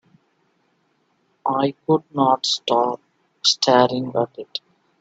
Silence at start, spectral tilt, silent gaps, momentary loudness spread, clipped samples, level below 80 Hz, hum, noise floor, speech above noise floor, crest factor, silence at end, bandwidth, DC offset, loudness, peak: 1.45 s; -4 dB/octave; none; 15 LU; under 0.1%; -68 dBFS; none; -66 dBFS; 46 dB; 20 dB; 0.45 s; 9 kHz; under 0.1%; -20 LUFS; -2 dBFS